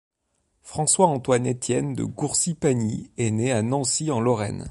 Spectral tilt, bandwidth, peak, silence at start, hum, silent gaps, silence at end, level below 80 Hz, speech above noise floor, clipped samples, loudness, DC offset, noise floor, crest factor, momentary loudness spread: -4.5 dB/octave; 11.5 kHz; -4 dBFS; 0.65 s; none; none; 0 s; -54 dBFS; 49 dB; under 0.1%; -23 LUFS; under 0.1%; -72 dBFS; 20 dB; 8 LU